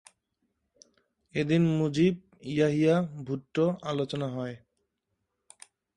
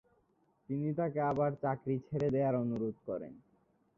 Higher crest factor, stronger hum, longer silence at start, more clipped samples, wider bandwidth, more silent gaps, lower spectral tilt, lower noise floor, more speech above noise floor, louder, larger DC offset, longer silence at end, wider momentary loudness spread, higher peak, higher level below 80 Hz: about the same, 18 dB vs 16 dB; neither; first, 1.35 s vs 0.7 s; neither; first, 11 kHz vs 6.6 kHz; neither; second, -7.5 dB/octave vs -9.5 dB/octave; first, -81 dBFS vs -74 dBFS; first, 54 dB vs 39 dB; first, -28 LUFS vs -35 LUFS; neither; first, 1.4 s vs 0.6 s; about the same, 12 LU vs 10 LU; first, -12 dBFS vs -20 dBFS; about the same, -66 dBFS vs -68 dBFS